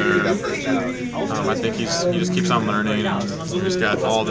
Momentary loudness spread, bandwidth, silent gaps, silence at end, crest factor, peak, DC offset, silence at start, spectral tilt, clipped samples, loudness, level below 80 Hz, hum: 5 LU; 8 kHz; none; 0 s; 16 dB; -4 dBFS; under 0.1%; 0 s; -5 dB/octave; under 0.1%; -21 LUFS; -48 dBFS; none